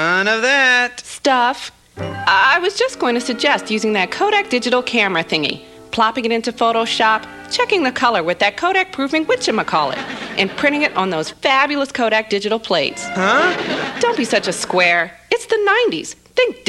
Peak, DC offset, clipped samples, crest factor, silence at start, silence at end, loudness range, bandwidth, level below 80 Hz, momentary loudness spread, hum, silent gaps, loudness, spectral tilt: -2 dBFS; under 0.1%; under 0.1%; 16 dB; 0 s; 0.1 s; 2 LU; 13 kHz; -56 dBFS; 7 LU; none; none; -16 LUFS; -3 dB/octave